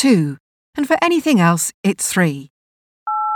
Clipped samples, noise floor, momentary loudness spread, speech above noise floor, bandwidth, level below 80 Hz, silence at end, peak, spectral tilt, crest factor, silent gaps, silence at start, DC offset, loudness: under 0.1%; under -90 dBFS; 17 LU; over 74 dB; 19.5 kHz; -62 dBFS; 0 s; -2 dBFS; -5 dB/octave; 16 dB; 0.40-0.73 s, 1.74-1.84 s, 2.50-3.06 s; 0 s; under 0.1%; -17 LUFS